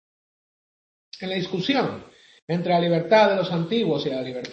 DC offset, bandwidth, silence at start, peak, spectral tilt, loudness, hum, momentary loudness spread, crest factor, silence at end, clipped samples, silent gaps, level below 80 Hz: under 0.1%; 7.8 kHz; 1.15 s; -6 dBFS; -6.5 dB/octave; -22 LUFS; none; 12 LU; 18 dB; 0 s; under 0.1%; 2.42-2.48 s; -68 dBFS